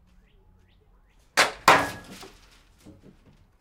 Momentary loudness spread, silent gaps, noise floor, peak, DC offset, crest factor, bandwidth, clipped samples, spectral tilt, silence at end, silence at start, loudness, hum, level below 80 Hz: 25 LU; none; -59 dBFS; -2 dBFS; under 0.1%; 26 dB; 16 kHz; under 0.1%; -2 dB/octave; 1.35 s; 1.35 s; -21 LUFS; none; -58 dBFS